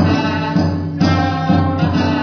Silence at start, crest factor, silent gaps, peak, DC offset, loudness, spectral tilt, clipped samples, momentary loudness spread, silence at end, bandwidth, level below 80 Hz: 0 s; 14 dB; none; -2 dBFS; under 0.1%; -16 LUFS; -7.5 dB/octave; under 0.1%; 2 LU; 0 s; 5.4 kHz; -40 dBFS